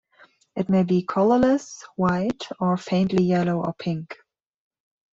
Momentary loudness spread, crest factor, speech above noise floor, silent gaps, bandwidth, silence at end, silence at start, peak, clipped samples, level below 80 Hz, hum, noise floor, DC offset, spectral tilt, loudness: 13 LU; 16 dB; 35 dB; none; 7.6 kHz; 1 s; 0.55 s; -8 dBFS; under 0.1%; -56 dBFS; none; -57 dBFS; under 0.1%; -7.5 dB/octave; -23 LUFS